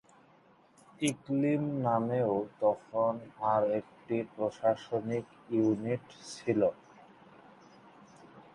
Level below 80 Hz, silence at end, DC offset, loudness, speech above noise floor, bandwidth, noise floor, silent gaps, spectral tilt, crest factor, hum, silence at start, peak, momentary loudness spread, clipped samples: -72 dBFS; 0.15 s; under 0.1%; -32 LUFS; 31 dB; 11.5 kHz; -63 dBFS; none; -6.5 dB/octave; 18 dB; none; 1 s; -16 dBFS; 7 LU; under 0.1%